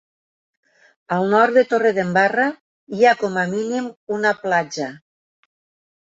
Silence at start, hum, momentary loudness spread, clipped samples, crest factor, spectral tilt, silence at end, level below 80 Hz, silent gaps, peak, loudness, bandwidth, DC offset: 1.1 s; none; 12 LU; under 0.1%; 18 dB; -5.5 dB/octave; 1.05 s; -68 dBFS; 2.61-2.87 s, 3.97-4.07 s; -2 dBFS; -19 LUFS; 7.8 kHz; under 0.1%